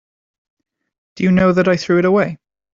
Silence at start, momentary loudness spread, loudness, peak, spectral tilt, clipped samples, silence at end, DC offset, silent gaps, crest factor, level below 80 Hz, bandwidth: 1.15 s; 6 LU; -15 LUFS; -2 dBFS; -7.5 dB/octave; under 0.1%; 0.4 s; under 0.1%; none; 14 dB; -48 dBFS; 7.4 kHz